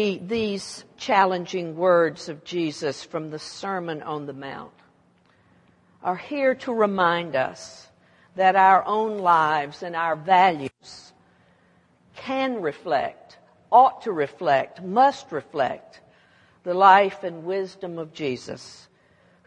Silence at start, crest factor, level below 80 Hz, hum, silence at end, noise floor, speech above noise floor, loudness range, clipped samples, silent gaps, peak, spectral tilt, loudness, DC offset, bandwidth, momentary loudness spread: 0 s; 22 dB; -70 dBFS; none; 0.7 s; -60 dBFS; 38 dB; 10 LU; under 0.1%; none; -2 dBFS; -5 dB/octave; -22 LUFS; under 0.1%; 11 kHz; 19 LU